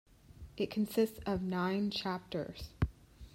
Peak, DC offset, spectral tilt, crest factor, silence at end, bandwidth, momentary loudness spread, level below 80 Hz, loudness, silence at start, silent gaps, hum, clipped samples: -18 dBFS; under 0.1%; -6.5 dB/octave; 18 dB; 0.05 s; 16 kHz; 9 LU; -52 dBFS; -36 LUFS; 0.3 s; none; none; under 0.1%